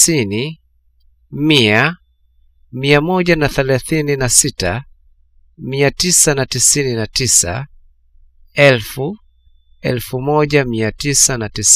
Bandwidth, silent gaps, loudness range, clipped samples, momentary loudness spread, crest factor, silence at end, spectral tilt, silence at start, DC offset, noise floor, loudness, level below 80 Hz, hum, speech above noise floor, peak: 16 kHz; none; 3 LU; under 0.1%; 14 LU; 16 dB; 0 s; -3 dB/octave; 0 s; under 0.1%; -53 dBFS; -14 LUFS; -38 dBFS; none; 39 dB; 0 dBFS